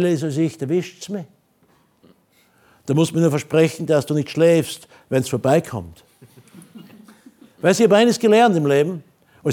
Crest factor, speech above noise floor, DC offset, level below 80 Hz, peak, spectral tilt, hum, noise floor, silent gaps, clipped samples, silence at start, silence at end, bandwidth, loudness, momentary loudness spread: 18 dB; 41 dB; under 0.1%; -62 dBFS; -2 dBFS; -6 dB/octave; none; -59 dBFS; none; under 0.1%; 0 s; 0 s; 18.5 kHz; -18 LUFS; 16 LU